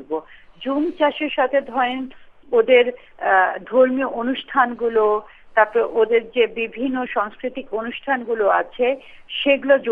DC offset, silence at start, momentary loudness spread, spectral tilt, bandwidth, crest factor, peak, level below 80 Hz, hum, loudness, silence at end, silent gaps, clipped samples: under 0.1%; 0 s; 11 LU; -6 dB/octave; 3.9 kHz; 20 dB; 0 dBFS; -56 dBFS; none; -20 LUFS; 0 s; none; under 0.1%